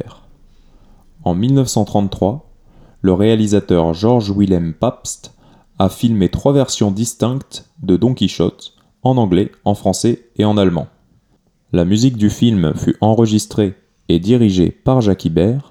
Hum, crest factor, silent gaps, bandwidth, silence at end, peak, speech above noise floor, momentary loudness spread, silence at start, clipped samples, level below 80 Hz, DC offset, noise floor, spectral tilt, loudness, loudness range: none; 16 dB; none; 15.5 kHz; 0.1 s; 0 dBFS; 44 dB; 7 LU; 0 s; under 0.1%; -40 dBFS; under 0.1%; -58 dBFS; -6.5 dB/octave; -15 LUFS; 3 LU